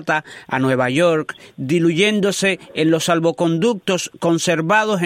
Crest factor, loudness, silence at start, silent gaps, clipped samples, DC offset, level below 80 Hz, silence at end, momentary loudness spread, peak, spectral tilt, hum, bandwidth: 16 dB; -18 LUFS; 0 s; none; under 0.1%; under 0.1%; -62 dBFS; 0 s; 6 LU; -2 dBFS; -4.5 dB/octave; none; 15.5 kHz